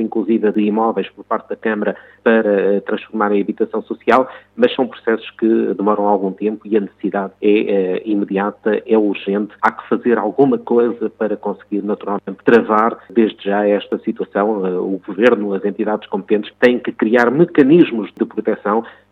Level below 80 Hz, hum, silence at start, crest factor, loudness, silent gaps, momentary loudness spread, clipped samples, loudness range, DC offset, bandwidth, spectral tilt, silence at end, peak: -66 dBFS; none; 0 s; 16 dB; -17 LUFS; none; 8 LU; under 0.1%; 3 LU; under 0.1%; 6.6 kHz; -8 dB/octave; 0.2 s; 0 dBFS